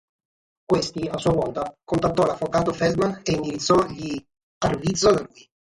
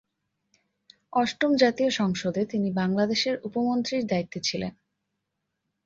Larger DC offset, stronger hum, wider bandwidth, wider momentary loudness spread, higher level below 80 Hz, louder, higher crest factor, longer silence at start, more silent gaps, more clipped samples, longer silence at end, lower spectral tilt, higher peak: neither; neither; first, 11.5 kHz vs 7.8 kHz; about the same, 9 LU vs 7 LU; first, -48 dBFS vs -64 dBFS; first, -23 LUFS vs -26 LUFS; about the same, 18 dB vs 20 dB; second, 0.7 s vs 1.15 s; first, 4.43-4.61 s vs none; neither; second, 0.5 s vs 1.15 s; about the same, -5 dB/octave vs -5 dB/octave; about the same, -6 dBFS vs -8 dBFS